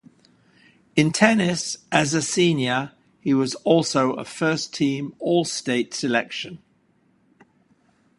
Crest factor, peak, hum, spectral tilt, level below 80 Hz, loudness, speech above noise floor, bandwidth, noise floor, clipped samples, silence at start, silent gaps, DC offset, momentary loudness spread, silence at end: 24 dB; 0 dBFS; none; -4.5 dB/octave; -62 dBFS; -22 LUFS; 41 dB; 11.5 kHz; -63 dBFS; under 0.1%; 0.95 s; none; under 0.1%; 9 LU; 1.6 s